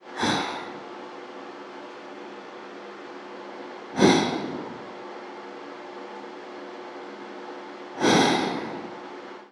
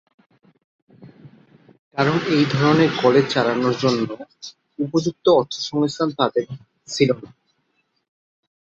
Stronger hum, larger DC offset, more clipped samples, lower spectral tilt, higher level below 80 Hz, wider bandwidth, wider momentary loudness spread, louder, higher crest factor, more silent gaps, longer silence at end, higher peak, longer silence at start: neither; neither; neither; second, -4 dB/octave vs -6 dB/octave; second, -66 dBFS vs -60 dBFS; first, 13 kHz vs 8 kHz; first, 20 LU vs 17 LU; second, -27 LUFS vs -20 LUFS; first, 24 dB vs 18 dB; second, none vs 1.79-1.91 s; second, 0 s vs 1.4 s; about the same, -4 dBFS vs -2 dBFS; second, 0 s vs 1 s